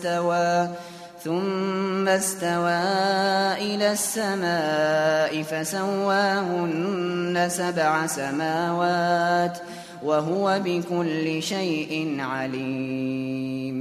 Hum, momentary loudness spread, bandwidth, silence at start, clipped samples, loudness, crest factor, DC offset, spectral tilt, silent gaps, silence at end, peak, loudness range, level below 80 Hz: none; 7 LU; 14 kHz; 0 s; under 0.1%; -24 LUFS; 16 dB; under 0.1%; -4.5 dB/octave; none; 0 s; -8 dBFS; 3 LU; -68 dBFS